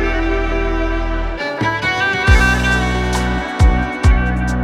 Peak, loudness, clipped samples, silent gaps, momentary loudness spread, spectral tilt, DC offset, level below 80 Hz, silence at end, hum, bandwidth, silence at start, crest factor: 0 dBFS; -16 LUFS; under 0.1%; none; 8 LU; -5.5 dB/octave; under 0.1%; -18 dBFS; 0 s; none; 13 kHz; 0 s; 14 dB